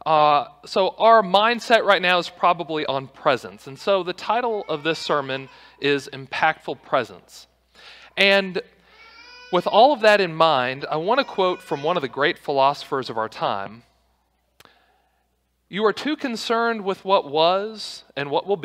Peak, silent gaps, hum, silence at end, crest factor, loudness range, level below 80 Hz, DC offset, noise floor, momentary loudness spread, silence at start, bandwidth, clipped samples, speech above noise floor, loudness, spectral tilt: -2 dBFS; none; none; 0 s; 20 dB; 8 LU; -66 dBFS; under 0.1%; -69 dBFS; 13 LU; 0.05 s; 15 kHz; under 0.1%; 48 dB; -21 LUFS; -4.5 dB/octave